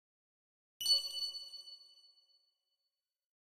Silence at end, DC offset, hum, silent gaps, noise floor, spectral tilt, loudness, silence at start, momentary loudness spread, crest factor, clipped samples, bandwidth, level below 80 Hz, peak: 1.6 s; under 0.1%; none; none; under -90 dBFS; 3 dB/octave; -34 LUFS; 0.8 s; 21 LU; 22 dB; under 0.1%; 15.5 kHz; -88 dBFS; -20 dBFS